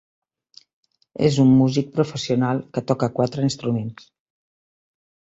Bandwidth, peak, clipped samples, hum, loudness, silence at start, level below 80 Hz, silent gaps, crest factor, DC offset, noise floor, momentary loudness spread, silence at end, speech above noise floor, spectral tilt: 8 kHz; -4 dBFS; under 0.1%; none; -21 LUFS; 1.2 s; -58 dBFS; none; 18 dB; under 0.1%; -53 dBFS; 10 LU; 1.3 s; 34 dB; -7 dB/octave